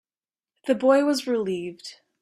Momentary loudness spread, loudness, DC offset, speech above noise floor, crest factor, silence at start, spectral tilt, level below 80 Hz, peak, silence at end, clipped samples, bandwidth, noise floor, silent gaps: 19 LU; -23 LUFS; under 0.1%; over 67 dB; 18 dB; 0.65 s; -4.5 dB/octave; -72 dBFS; -6 dBFS; 0.3 s; under 0.1%; 14 kHz; under -90 dBFS; none